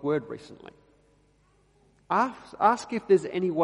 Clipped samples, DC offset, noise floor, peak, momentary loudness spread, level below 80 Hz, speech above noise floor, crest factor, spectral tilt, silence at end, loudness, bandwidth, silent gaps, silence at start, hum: under 0.1%; under 0.1%; -64 dBFS; -6 dBFS; 18 LU; -68 dBFS; 38 dB; 22 dB; -6 dB/octave; 0 s; -26 LUFS; 11 kHz; none; 0 s; 50 Hz at -65 dBFS